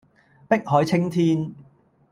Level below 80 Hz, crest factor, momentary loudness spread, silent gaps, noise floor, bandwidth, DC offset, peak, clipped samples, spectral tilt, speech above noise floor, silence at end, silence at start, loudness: -62 dBFS; 18 dB; 6 LU; none; -55 dBFS; 15 kHz; under 0.1%; -4 dBFS; under 0.1%; -7.5 dB/octave; 35 dB; 0.5 s; 0.5 s; -22 LUFS